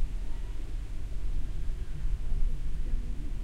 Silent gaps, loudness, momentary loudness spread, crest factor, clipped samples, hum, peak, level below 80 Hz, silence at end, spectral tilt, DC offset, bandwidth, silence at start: none; -39 LUFS; 5 LU; 12 dB; under 0.1%; none; -16 dBFS; -30 dBFS; 0 s; -6.5 dB/octave; under 0.1%; 5 kHz; 0 s